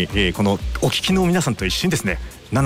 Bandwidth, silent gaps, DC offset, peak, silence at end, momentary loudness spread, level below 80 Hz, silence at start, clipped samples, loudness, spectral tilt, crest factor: 16 kHz; none; under 0.1%; -8 dBFS; 0 s; 7 LU; -32 dBFS; 0 s; under 0.1%; -20 LUFS; -4.5 dB/octave; 12 dB